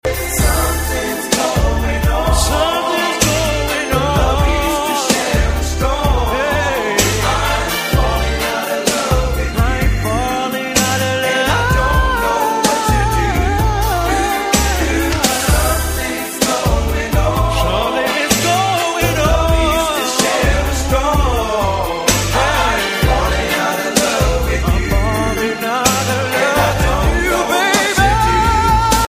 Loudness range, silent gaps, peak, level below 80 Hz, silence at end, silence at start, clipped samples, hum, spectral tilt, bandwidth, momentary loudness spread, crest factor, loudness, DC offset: 1 LU; none; 0 dBFS; -20 dBFS; 0 s; 0.05 s; under 0.1%; none; -4 dB/octave; 15.5 kHz; 4 LU; 14 dB; -15 LUFS; under 0.1%